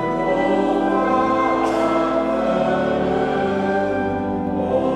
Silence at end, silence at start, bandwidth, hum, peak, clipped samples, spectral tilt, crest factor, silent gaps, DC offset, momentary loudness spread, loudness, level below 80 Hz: 0 s; 0 s; 11.5 kHz; none; -6 dBFS; under 0.1%; -7 dB/octave; 12 dB; none; under 0.1%; 4 LU; -19 LUFS; -44 dBFS